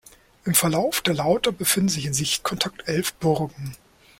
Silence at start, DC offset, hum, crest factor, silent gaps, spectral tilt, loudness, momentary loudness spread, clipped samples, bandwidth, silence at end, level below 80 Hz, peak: 0.45 s; under 0.1%; none; 22 dB; none; -3.5 dB/octave; -22 LUFS; 9 LU; under 0.1%; 16.5 kHz; 0.45 s; -54 dBFS; -2 dBFS